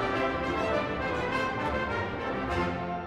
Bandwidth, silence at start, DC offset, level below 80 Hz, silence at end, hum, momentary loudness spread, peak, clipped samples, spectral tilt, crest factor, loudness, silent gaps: 14 kHz; 0 s; under 0.1%; -46 dBFS; 0 s; none; 3 LU; -16 dBFS; under 0.1%; -6 dB/octave; 14 dB; -30 LUFS; none